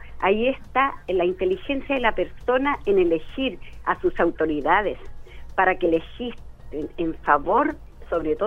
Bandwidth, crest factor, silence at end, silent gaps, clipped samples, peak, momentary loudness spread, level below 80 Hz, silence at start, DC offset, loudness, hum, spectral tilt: 6.4 kHz; 20 dB; 0 s; none; under 0.1%; -2 dBFS; 11 LU; -40 dBFS; 0 s; under 0.1%; -23 LUFS; none; -7 dB/octave